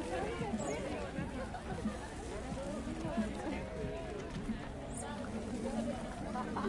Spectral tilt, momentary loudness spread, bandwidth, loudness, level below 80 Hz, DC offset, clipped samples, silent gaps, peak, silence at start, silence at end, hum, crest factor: -5.5 dB/octave; 5 LU; 11.5 kHz; -41 LUFS; -50 dBFS; under 0.1%; under 0.1%; none; -26 dBFS; 0 s; 0 s; none; 14 dB